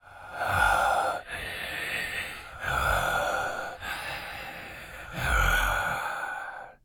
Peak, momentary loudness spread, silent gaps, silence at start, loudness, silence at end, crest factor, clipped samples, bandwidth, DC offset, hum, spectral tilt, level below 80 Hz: -10 dBFS; 15 LU; none; 0.05 s; -29 LUFS; 0.1 s; 20 dB; under 0.1%; 19.5 kHz; under 0.1%; none; -3 dB/octave; -40 dBFS